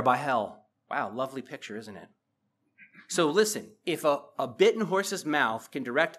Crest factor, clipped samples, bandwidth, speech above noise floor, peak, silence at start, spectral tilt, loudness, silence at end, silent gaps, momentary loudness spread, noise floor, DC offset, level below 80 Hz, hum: 20 dB; under 0.1%; 15 kHz; 49 dB; -8 dBFS; 0 s; -3.5 dB/octave; -28 LUFS; 0 s; none; 15 LU; -77 dBFS; under 0.1%; -84 dBFS; none